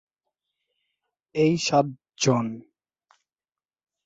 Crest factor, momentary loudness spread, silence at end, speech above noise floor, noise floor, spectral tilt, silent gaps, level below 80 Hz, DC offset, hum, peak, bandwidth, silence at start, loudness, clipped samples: 20 dB; 12 LU; 1.45 s; over 67 dB; under -90 dBFS; -5 dB/octave; none; -66 dBFS; under 0.1%; none; -8 dBFS; 8.2 kHz; 1.35 s; -24 LUFS; under 0.1%